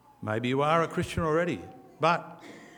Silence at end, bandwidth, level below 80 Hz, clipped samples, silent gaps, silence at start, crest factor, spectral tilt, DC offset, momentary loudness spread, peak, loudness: 0.1 s; 20 kHz; -56 dBFS; under 0.1%; none; 0.2 s; 20 dB; -6 dB/octave; under 0.1%; 18 LU; -10 dBFS; -28 LUFS